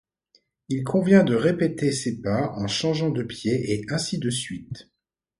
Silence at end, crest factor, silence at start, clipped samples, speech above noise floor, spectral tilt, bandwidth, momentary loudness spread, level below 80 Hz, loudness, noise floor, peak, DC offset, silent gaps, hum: 0.6 s; 20 dB; 0.7 s; under 0.1%; 42 dB; -5.5 dB/octave; 11.5 kHz; 13 LU; -56 dBFS; -24 LUFS; -65 dBFS; -4 dBFS; under 0.1%; none; none